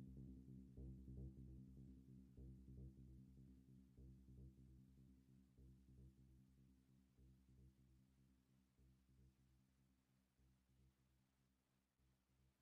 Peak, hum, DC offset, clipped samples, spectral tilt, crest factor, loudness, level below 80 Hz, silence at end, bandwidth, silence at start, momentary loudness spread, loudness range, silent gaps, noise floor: -48 dBFS; none; under 0.1%; under 0.1%; -12 dB/octave; 18 dB; -64 LUFS; -70 dBFS; 0 s; 3.5 kHz; 0 s; 10 LU; 7 LU; none; -87 dBFS